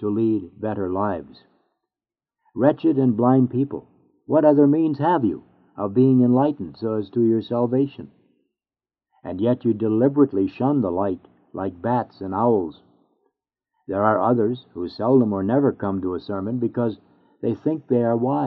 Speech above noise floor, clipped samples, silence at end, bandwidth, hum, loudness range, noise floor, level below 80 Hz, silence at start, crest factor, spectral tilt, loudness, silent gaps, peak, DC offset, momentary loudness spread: over 70 dB; under 0.1%; 0 s; 4.8 kHz; none; 5 LU; under -90 dBFS; -64 dBFS; 0 s; 20 dB; -8.5 dB/octave; -21 LUFS; none; -2 dBFS; under 0.1%; 13 LU